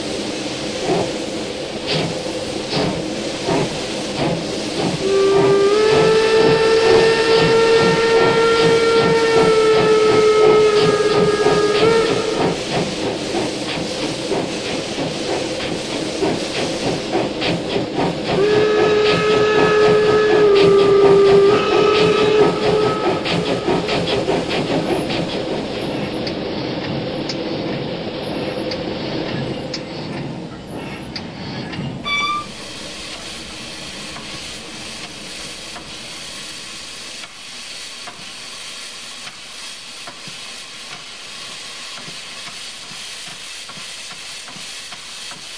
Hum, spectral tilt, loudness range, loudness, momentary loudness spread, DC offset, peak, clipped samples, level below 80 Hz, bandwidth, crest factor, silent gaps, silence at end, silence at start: none; -4.5 dB/octave; 16 LU; -17 LUFS; 17 LU; under 0.1%; -2 dBFS; under 0.1%; -46 dBFS; 11 kHz; 16 dB; none; 0 s; 0 s